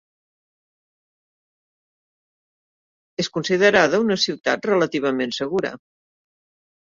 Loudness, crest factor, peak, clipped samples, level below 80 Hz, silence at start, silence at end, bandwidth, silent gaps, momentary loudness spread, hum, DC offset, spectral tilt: -20 LUFS; 24 dB; 0 dBFS; under 0.1%; -64 dBFS; 3.2 s; 1.05 s; 7.6 kHz; none; 11 LU; none; under 0.1%; -4 dB/octave